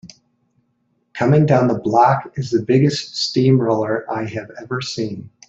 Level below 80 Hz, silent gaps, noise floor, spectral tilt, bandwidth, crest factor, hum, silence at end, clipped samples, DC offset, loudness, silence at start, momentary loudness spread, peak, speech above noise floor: -56 dBFS; none; -66 dBFS; -6.5 dB/octave; 8 kHz; 16 dB; none; 0.2 s; under 0.1%; under 0.1%; -18 LUFS; 0.05 s; 13 LU; -2 dBFS; 49 dB